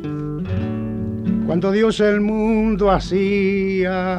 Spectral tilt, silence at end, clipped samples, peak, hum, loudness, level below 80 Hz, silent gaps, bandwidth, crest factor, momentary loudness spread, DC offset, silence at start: -7.5 dB/octave; 0 s; under 0.1%; -4 dBFS; none; -19 LUFS; -36 dBFS; none; 9.2 kHz; 16 dB; 8 LU; under 0.1%; 0 s